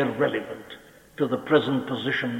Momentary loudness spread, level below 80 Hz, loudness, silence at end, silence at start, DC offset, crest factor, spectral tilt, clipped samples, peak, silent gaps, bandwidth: 22 LU; -66 dBFS; -25 LUFS; 0 s; 0 s; under 0.1%; 20 dB; -6.5 dB/octave; under 0.1%; -6 dBFS; none; 16.5 kHz